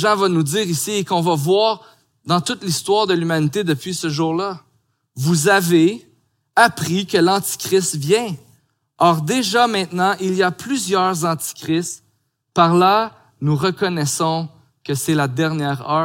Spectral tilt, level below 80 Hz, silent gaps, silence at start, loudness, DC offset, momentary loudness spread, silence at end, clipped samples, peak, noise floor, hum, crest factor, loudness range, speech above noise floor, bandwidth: -4.5 dB/octave; -64 dBFS; none; 0 s; -18 LUFS; under 0.1%; 10 LU; 0 s; under 0.1%; 0 dBFS; -66 dBFS; none; 18 dB; 2 LU; 48 dB; 17 kHz